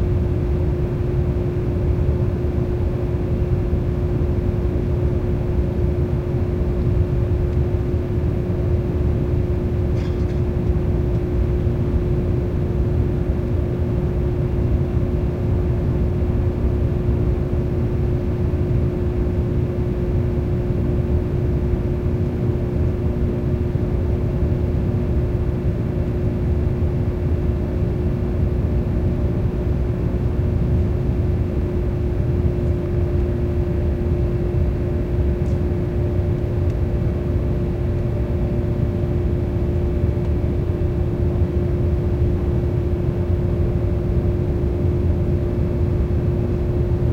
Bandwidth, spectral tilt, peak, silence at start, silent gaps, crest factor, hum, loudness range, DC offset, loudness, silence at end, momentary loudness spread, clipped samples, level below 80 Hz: 6.2 kHz; -10 dB/octave; -6 dBFS; 0 s; none; 14 dB; none; 1 LU; under 0.1%; -21 LUFS; 0 s; 2 LU; under 0.1%; -24 dBFS